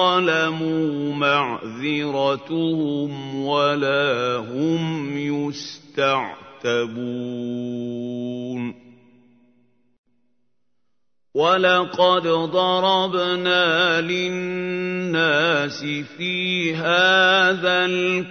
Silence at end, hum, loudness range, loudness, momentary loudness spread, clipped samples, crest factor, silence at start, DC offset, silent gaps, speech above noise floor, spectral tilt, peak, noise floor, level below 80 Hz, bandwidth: 0 s; none; 12 LU; -20 LUFS; 11 LU; under 0.1%; 18 dB; 0 s; under 0.1%; 9.98-10.04 s; 59 dB; -5 dB/octave; -4 dBFS; -80 dBFS; -70 dBFS; 6.6 kHz